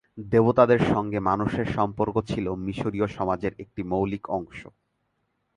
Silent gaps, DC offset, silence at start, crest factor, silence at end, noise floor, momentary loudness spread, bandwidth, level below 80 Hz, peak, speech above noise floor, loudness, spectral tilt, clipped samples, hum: none; under 0.1%; 0.15 s; 22 dB; 0.95 s; -74 dBFS; 12 LU; 10.5 kHz; -48 dBFS; -4 dBFS; 50 dB; -25 LUFS; -8 dB/octave; under 0.1%; none